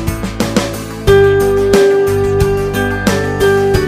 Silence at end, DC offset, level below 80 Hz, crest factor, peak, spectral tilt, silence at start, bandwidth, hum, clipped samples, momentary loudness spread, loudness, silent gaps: 0 s; under 0.1%; -26 dBFS; 12 dB; 0 dBFS; -5.5 dB/octave; 0 s; 15.5 kHz; none; under 0.1%; 8 LU; -12 LUFS; none